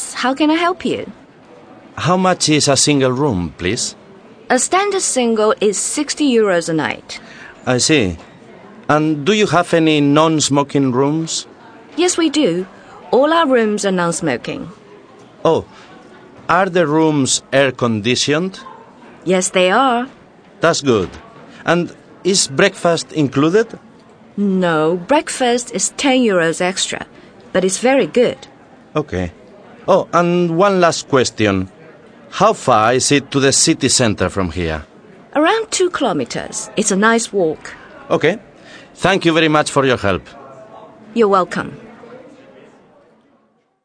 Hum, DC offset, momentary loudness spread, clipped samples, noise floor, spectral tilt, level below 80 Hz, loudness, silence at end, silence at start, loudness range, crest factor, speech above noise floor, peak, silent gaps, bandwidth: none; under 0.1%; 13 LU; under 0.1%; -58 dBFS; -4 dB/octave; -48 dBFS; -15 LUFS; 1.55 s; 0 s; 3 LU; 16 dB; 43 dB; 0 dBFS; none; 10.5 kHz